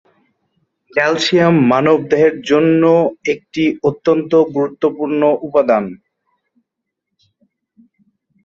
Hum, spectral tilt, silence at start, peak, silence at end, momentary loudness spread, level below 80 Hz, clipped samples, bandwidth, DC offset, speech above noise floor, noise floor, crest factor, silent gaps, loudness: none; -6 dB/octave; 0.95 s; -2 dBFS; 2.5 s; 7 LU; -58 dBFS; under 0.1%; 7.8 kHz; under 0.1%; 65 dB; -78 dBFS; 14 dB; none; -14 LUFS